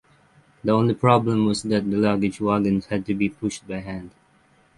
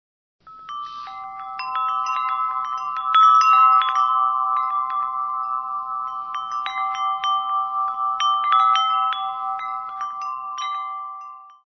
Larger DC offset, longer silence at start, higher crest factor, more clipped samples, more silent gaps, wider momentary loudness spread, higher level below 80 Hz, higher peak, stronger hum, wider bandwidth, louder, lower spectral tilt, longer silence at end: neither; first, 0.65 s vs 0.45 s; first, 22 dB vs 16 dB; neither; neither; second, 13 LU vs 18 LU; first, -52 dBFS vs -70 dBFS; first, -2 dBFS vs -6 dBFS; neither; first, 11.5 kHz vs 6.4 kHz; about the same, -22 LUFS vs -20 LUFS; first, -6.5 dB/octave vs 1 dB/octave; first, 0.7 s vs 0.15 s